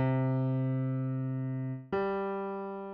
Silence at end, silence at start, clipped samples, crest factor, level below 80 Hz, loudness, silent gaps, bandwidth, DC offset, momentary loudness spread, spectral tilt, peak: 0 s; 0 s; under 0.1%; 12 dB; -66 dBFS; -33 LUFS; none; 4.8 kHz; under 0.1%; 7 LU; -9 dB/octave; -18 dBFS